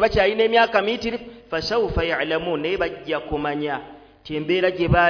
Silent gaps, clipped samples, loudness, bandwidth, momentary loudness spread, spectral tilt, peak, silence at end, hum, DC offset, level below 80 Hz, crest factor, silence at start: none; under 0.1%; -22 LUFS; 5.4 kHz; 12 LU; -6 dB/octave; -4 dBFS; 0 s; none; under 0.1%; -40 dBFS; 18 dB; 0 s